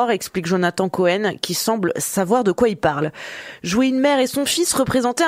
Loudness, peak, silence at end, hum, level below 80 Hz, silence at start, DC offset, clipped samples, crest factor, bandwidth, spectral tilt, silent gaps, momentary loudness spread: -19 LUFS; -2 dBFS; 0 s; none; -52 dBFS; 0 s; under 0.1%; under 0.1%; 18 dB; 16 kHz; -4 dB/octave; none; 6 LU